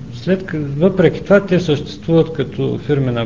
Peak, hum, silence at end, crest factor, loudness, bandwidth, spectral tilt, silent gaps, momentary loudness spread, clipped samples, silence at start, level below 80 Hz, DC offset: 0 dBFS; none; 0 s; 16 dB; -16 LUFS; 7.4 kHz; -8 dB/octave; none; 7 LU; under 0.1%; 0 s; -40 dBFS; 0.8%